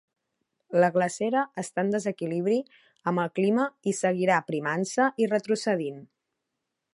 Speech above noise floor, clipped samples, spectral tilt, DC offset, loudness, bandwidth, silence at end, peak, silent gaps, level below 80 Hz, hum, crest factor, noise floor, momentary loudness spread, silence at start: 57 dB; under 0.1%; -5.5 dB/octave; under 0.1%; -27 LUFS; 11.5 kHz; 0.9 s; -8 dBFS; none; -78 dBFS; none; 20 dB; -83 dBFS; 6 LU; 0.7 s